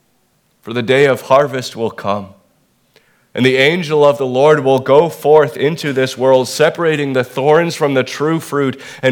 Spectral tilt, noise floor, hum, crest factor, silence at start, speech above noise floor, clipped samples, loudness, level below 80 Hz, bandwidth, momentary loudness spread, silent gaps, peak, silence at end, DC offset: -5.5 dB/octave; -59 dBFS; none; 14 dB; 0.65 s; 46 dB; under 0.1%; -14 LUFS; -62 dBFS; 18 kHz; 10 LU; none; 0 dBFS; 0 s; under 0.1%